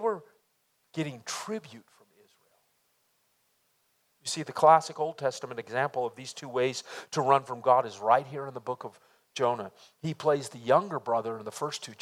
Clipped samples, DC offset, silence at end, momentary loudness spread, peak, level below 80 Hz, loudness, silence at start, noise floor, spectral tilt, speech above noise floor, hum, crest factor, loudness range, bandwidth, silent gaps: under 0.1%; under 0.1%; 0.1 s; 14 LU; -6 dBFS; -82 dBFS; -29 LUFS; 0 s; -73 dBFS; -4.5 dB/octave; 44 dB; none; 24 dB; 13 LU; 15.5 kHz; none